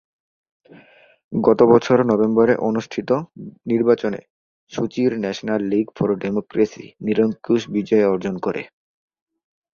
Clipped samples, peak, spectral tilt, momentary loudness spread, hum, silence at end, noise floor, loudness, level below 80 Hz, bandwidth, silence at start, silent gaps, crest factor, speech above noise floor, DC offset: under 0.1%; -2 dBFS; -7 dB/octave; 12 LU; none; 1.1 s; -50 dBFS; -19 LUFS; -58 dBFS; 7.2 kHz; 1.3 s; 4.30-4.67 s; 18 dB; 31 dB; under 0.1%